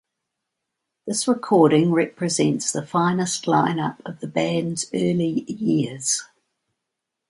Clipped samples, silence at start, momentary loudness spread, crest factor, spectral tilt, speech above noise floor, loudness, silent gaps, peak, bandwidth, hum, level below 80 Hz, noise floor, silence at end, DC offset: under 0.1%; 1.05 s; 9 LU; 18 dB; -5 dB/octave; 61 dB; -21 LUFS; none; -4 dBFS; 11.5 kHz; none; -66 dBFS; -82 dBFS; 1.05 s; under 0.1%